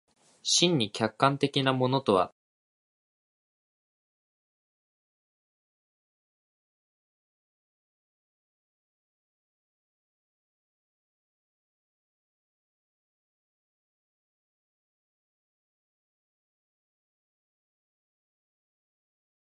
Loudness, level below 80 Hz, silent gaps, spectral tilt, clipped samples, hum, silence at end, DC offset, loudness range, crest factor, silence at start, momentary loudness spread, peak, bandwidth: -26 LUFS; -74 dBFS; none; -4 dB/octave; under 0.1%; none; 17.3 s; under 0.1%; 8 LU; 30 dB; 0.45 s; 7 LU; -6 dBFS; 11 kHz